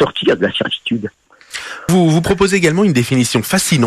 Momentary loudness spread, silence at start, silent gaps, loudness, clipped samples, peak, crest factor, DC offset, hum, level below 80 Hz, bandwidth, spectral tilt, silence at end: 13 LU; 0 s; none; -14 LUFS; under 0.1%; -2 dBFS; 12 dB; under 0.1%; none; -42 dBFS; 14 kHz; -5 dB/octave; 0 s